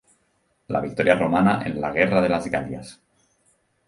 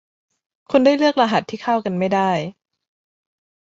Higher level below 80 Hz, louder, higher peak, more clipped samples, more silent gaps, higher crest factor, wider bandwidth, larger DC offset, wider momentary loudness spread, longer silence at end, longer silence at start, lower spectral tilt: first, -52 dBFS vs -64 dBFS; second, -21 LUFS vs -18 LUFS; about the same, -2 dBFS vs -2 dBFS; neither; neither; about the same, 22 dB vs 18 dB; first, 11.5 kHz vs 7.8 kHz; neither; first, 13 LU vs 7 LU; second, 0.95 s vs 1.2 s; about the same, 0.7 s vs 0.7 s; about the same, -7 dB/octave vs -6 dB/octave